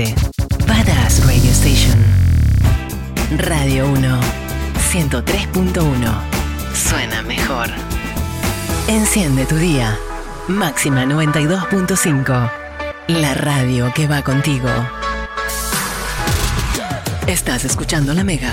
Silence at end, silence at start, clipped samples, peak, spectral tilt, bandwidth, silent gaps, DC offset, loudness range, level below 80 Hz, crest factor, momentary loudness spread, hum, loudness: 0 s; 0 s; under 0.1%; -2 dBFS; -4.5 dB/octave; 17 kHz; none; under 0.1%; 5 LU; -22 dBFS; 14 dB; 9 LU; none; -16 LUFS